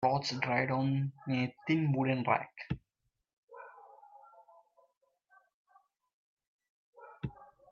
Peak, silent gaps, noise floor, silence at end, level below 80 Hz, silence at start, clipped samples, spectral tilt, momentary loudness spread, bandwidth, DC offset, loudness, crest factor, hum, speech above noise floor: -14 dBFS; 3.33-3.48 s, 4.97-5.01 s, 5.54-5.65 s, 6.13-6.37 s, 6.47-6.59 s, 6.70-6.93 s; -84 dBFS; 0.25 s; -66 dBFS; 0 s; under 0.1%; -6.5 dB/octave; 18 LU; 7.6 kHz; under 0.1%; -34 LUFS; 24 dB; none; 52 dB